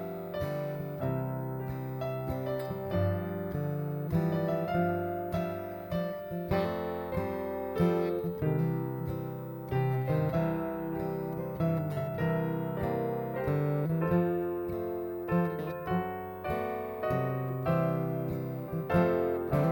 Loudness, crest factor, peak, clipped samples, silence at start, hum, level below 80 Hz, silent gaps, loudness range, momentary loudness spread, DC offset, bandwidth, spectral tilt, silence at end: -32 LUFS; 18 dB; -14 dBFS; under 0.1%; 0 s; none; -54 dBFS; none; 2 LU; 7 LU; under 0.1%; 19.5 kHz; -9 dB/octave; 0 s